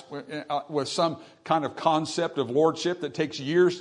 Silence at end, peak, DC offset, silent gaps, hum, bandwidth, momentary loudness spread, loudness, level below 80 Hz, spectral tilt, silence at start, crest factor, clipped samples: 0 s; -6 dBFS; under 0.1%; none; none; 10.5 kHz; 8 LU; -27 LUFS; -72 dBFS; -5 dB/octave; 0 s; 20 dB; under 0.1%